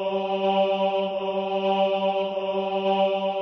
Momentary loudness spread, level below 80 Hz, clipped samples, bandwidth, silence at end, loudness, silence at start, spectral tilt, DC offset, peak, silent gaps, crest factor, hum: 4 LU; -70 dBFS; under 0.1%; 6.2 kHz; 0 s; -24 LUFS; 0 s; -7 dB/octave; under 0.1%; -12 dBFS; none; 12 dB; none